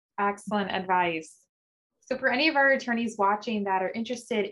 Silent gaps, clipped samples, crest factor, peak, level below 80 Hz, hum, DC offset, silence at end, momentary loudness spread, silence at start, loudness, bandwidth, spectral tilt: 1.49-1.90 s; under 0.1%; 18 dB; -10 dBFS; -70 dBFS; none; under 0.1%; 0 s; 9 LU; 0.2 s; -26 LUFS; 12 kHz; -4.5 dB/octave